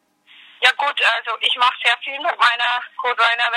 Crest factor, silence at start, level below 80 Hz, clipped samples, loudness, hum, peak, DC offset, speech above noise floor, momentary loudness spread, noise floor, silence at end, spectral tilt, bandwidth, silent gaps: 18 dB; 0.6 s; under -90 dBFS; under 0.1%; -17 LUFS; none; 0 dBFS; under 0.1%; 30 dB; 5 LU; -49 dBFS; 0 s; 3 dB/octave; 15.5 kHz; none